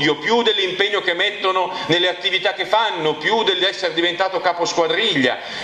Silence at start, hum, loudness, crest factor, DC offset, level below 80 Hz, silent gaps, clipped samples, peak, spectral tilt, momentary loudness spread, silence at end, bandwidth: 0 s; none; -18 LUFS; 18 dB; under 0.1%; -62 dBFS; none; under 0.1%; -2 dBFS; -3 dB/octave; 3 LU; 0 s; 10 kHz